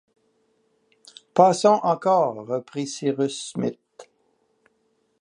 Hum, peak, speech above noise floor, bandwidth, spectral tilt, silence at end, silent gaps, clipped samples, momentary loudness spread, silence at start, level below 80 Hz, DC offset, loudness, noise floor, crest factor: none; -2 dBFS; 48 dB; 11 kHz; -5.5 dB/octave; 1.2 s; none; under 0.1%; 12 LU; 1.35 s; -76 dBFS; under 0.1%; -22 LUFS; -69 dBFS; 22 dB